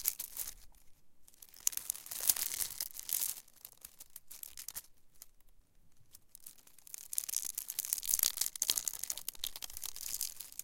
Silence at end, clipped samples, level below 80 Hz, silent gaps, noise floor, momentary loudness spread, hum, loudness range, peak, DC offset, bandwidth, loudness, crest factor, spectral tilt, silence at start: 0 s; under 0.1%; -66 dBFS; none; -61 dBFS; 21 LU; none; 15 LU; -6 dBFS; under 0.1%; 17 kHz; -36 LUFS; 36 dB; 2 dB/octave; 0 s